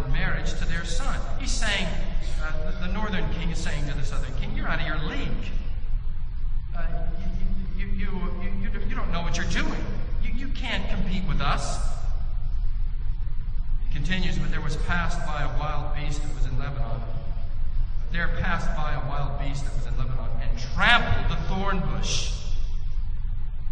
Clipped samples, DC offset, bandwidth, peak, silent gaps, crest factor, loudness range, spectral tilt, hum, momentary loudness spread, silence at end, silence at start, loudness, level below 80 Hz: under 0.1%; 0.4%; 9 kHz; -2 dBFS; none; 20 dB; 6 LU; -4.5 dB/octave; none; 7 LU; 0 s; 0 s; -30 LUFS; -24 dBFS